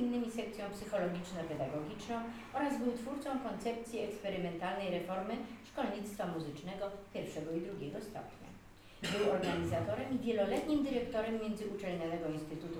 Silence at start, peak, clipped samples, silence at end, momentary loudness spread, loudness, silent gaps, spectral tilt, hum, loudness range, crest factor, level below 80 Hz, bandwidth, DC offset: 0 s; -20 dBFS; under 0.1%; 0 s; 9 LU; -39 LUFS; none; -6 dB/octave; none; 6 LU; 18 dB; -62 dBFS; over 20 kHz; under 0.1%